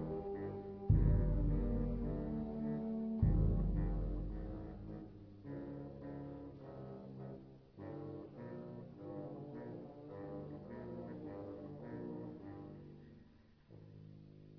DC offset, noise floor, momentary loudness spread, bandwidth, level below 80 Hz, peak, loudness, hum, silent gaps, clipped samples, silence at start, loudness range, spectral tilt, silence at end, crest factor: under 0.1%; -64 dBFS; 20 LU; 4.7 kHz; -44 dBFS; -20 dBFS; -42 LUFS; none; none; under 0.1%; 0 s; 13 LU; -11 dB/octave; 0 s; 22 dB